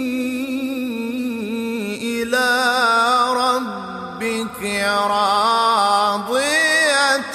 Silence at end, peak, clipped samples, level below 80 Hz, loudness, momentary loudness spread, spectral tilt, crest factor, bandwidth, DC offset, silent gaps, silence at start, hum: 0 s; -2 dBFS; under 0.1%; -58 dBFS; -18 LUFS; 10 LU; -2.5 dB/octave; 16 dB; 16 kHz; under 0.1%; none; 0 s; none